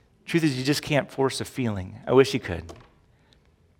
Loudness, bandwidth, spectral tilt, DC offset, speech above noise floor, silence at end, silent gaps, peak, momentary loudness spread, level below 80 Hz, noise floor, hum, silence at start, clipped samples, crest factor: -25 LUFS; 17 kHz; -5.5 dB/octave; under 0.1%; 35 dB; 1 s; none; -4 dBFS; 14 LU; -54 dBFS; -60 dBFS; none; 0.25 s; under 0.1%; 22 dB